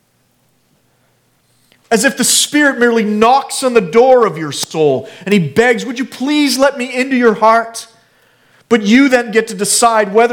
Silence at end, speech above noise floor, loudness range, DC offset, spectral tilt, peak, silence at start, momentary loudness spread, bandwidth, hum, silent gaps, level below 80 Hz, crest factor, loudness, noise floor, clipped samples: 0 s; 46 dB; 3 LU; under 0.1%; -3.5 dB/octave; 0 dBFS; 1.9 s; 8 LU; 18.5 kHz; none; none; -56 dBFS; 12 dB; -12 LUFS; -57 dBFS; under 0.1%